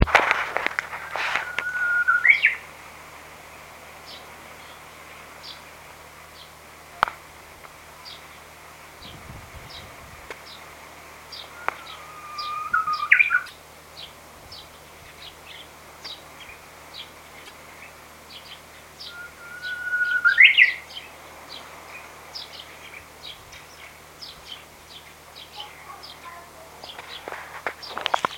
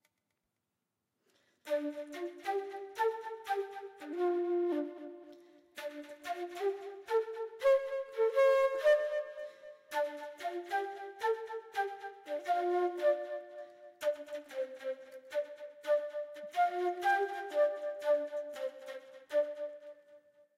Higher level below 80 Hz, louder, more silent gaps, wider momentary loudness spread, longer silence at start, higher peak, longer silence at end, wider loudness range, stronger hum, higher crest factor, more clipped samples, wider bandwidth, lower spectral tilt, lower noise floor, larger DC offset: first, -48 dBFS vs -82 dBFS; first, -20 LUFS vs -35 LUFS; neither; first, 25 LU vs 16 LU; second, 0 s vs 1.65 s; first, 0 dBFS vs -20 dBFS; second, 0 s vs 0.4 s; first, 21 LU vs 7 LU; neither; first, 28 dB vs 16 dB; neither; about the same, 17 kHz vs 15.5 kHz; about the same, -2.5 dB/octave vs -2.5 dB/octave; second, -45 dBFS vs -87 dBFS; neither